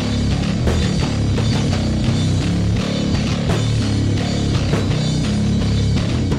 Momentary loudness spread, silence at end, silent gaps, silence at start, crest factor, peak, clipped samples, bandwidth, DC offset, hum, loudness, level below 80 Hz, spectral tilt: 1 LU; 0 s; none; 0 s; 14 dB; -4 dBFS; under 0.1%; 11.5 kHz; under 0.1%; none; -18 LUFS; -26 dBFS; -6 dB/octave